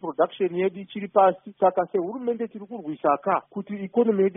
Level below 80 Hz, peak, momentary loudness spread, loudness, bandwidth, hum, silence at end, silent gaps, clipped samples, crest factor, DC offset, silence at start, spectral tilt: -74 dBFS; -6 dBFS; 13 LU; -24 LUFS; 3.8 kHz; none; 0.05 s; none; under 0.1%; 18 dB; under 0.1%; 0.05 s; -3 dB/octave